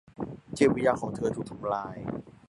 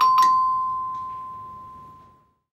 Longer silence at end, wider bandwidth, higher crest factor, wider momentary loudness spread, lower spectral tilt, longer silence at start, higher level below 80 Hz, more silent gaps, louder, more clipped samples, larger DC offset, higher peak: second, 0.15 s vs 0.6 s; second, 11.5 kHz vs 15 kHz; first, 22 dB vs 16 dB; second, 14 LU vs 24 LU; first, -6.5 dB/octave vs -2 dB/octave; first, 0.2 s vs 0 s; about the same, -58 dBFS vs -62 dBFS; neither; second, -29 LUFS vs -21 LUFS; neither; neither; about the same, -8 dBFS vs -6 dBFS